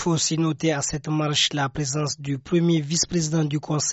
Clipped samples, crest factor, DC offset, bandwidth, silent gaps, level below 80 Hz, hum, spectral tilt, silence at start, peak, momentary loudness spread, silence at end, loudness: under 0.1%; 16 dB; under 0.1%; 8.2 kHz; none; -52 dBFS; none; -4 dB/octave; 0 s; -8 dBFS; 5 LU; 0 s; -23 LUFS